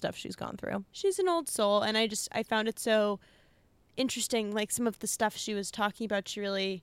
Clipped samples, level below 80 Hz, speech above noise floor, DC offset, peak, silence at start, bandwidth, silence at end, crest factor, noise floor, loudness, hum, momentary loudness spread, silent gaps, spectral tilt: under 0.1%; -68 dBFS; 34 dB; under 0.1%; -14 dBFS; 0 s; 16.5 kHz; 0 s; 16 dB; -65 dBFS; -31 LUFS; none; 9 LU; none; -3 dB/octave